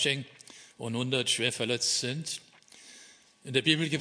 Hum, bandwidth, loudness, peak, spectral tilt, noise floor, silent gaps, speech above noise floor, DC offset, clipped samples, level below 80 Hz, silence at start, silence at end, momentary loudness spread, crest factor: none; 11 kHz; -29 LUFS; -8 dBFS; -3 dB/octave; -56 dBFS; none; 26 dB; under 0.1%; under 0.1%; -76 dBFS; 0 s; 0 s; 23 LU; 24 dB